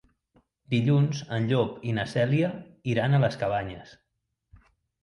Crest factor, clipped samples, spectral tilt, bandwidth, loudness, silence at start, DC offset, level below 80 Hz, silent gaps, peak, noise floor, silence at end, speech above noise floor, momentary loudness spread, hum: 18 dB; under 0.1%; -7.5 dB/octave; 10.5 kHz; -26 LUFS; 0.7 s; under 0.1%; -58 dBFS; none; -10 dBFS; -80 dBFS; 1.1 s; 55 dB; 8 LU; none